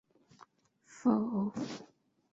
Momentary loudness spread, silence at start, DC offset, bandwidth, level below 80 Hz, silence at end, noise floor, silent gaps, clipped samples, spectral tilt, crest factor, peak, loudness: 12 LU; 0.9 s; under 0.1%; 7.8 kHz; -78 dBFS; 0.5 s; -66 dBFS; none; under 0.1%; -7 dB/octave; 20 dB; -18 dBFS; -34 LUFS